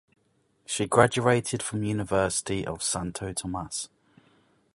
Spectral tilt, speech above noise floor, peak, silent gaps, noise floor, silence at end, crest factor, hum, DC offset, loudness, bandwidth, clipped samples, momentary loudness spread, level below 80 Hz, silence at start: -4 dB/octave; 42 dB; -2 dBFS; none; -69 dBFS; 0.9 s; 26 dB; none; under 0.1%; -27 LUFS; 11.5 kHz; under 0.1%; 12 LU; -52 dBFS; 0.7 s